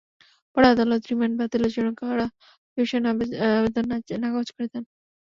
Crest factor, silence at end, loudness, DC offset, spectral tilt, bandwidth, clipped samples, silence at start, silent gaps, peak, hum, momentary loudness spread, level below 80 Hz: 20 dB; 0.4 s; -24 LUFS; under 0.1%; -6.5 dB/octave; 7.2 kHz; under 0.1%; 0.55 s; 2.58-2.76 s; -4 dBFS; none; 13 LU; -54 dBFS